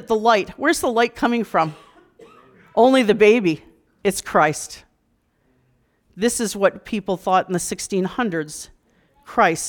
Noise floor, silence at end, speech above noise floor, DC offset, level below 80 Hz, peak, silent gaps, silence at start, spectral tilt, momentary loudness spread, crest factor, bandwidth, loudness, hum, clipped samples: -66 dBFS; 0 s; 47 dB; under 0.1%; -54 dBFS; -4 dBFS; none; 0 s; -4 dB/octave; 13 LU; 18 dB; 19.5 kHz; -19 LUFS; none; under 0.1%